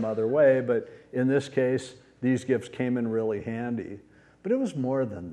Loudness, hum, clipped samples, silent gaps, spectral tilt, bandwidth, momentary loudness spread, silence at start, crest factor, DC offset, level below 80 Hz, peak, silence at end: -27 LUFS; none; under 0.1%; none; -7.5 dB/octave; 10.5 kHz; 13 LU; 0 s; 16 dB; under 0.1%; -66 dBFS; -10 dBFS; 0 s